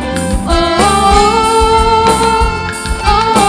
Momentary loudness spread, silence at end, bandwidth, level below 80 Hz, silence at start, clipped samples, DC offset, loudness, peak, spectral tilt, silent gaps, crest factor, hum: 7 LU; 0 s; 11 kHz; -20 dBFS; 0 s; 0.3%; under 0.1%; -10 LUFS; 0 dBFS; -4 dB/octave; none; 10 dB; none